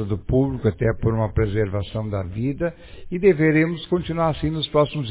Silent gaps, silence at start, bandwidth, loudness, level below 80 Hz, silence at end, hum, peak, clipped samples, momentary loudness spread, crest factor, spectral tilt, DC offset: none; 0 s; 4 kHz; -22 LUFS; -36 dBFS; 0 s; none; -4 dBFS; under 0.1%; 9 LU; 16 dB; -11.5 dB/octave; under 0.1%